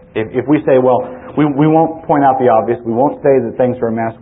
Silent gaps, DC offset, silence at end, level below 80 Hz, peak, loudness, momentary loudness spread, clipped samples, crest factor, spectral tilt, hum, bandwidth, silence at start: none; under 0.1%; 0.05 s; -48 dBFS; 0 dBFS; -13 LUFS; 7 LU; under 0.1%; 12 dB; -13.5 dB/octave; none; 3.8 kHz; 0.15 s